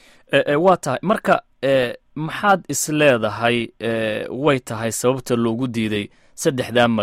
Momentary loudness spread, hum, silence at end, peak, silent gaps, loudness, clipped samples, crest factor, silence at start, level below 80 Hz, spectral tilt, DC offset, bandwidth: 8 LU; none; 0 s; -2 dBFS; none; -20 LUFS; under 0.1%; 18 dB; 0.3 s; -54 dBFS; -4.5 dB/octave; under 0.1%; 16 kHz